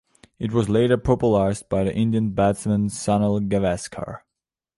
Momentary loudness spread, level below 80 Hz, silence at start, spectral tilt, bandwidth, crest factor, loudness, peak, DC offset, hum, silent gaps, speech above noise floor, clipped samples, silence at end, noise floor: 12 LU; -44 dBFS; 0.4 s; -7 dB/octave; 11.5 kHz; 16 dB; -22 LUFS; -6 dBFS; under 0.1%; none; none; 65 dB; under 0.1%; 0.6 s; -86 dBFS